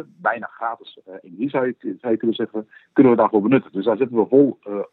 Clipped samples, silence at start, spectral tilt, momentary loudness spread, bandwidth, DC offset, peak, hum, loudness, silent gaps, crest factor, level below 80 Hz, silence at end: under 0.1%; 0 s; -10.5 dB/octave; 13 LU; 4.1 kHz; under 0.1%; -2 dBFS; none; -20 LUFS; none; 18 dB; -80 dBFS; 0.1 s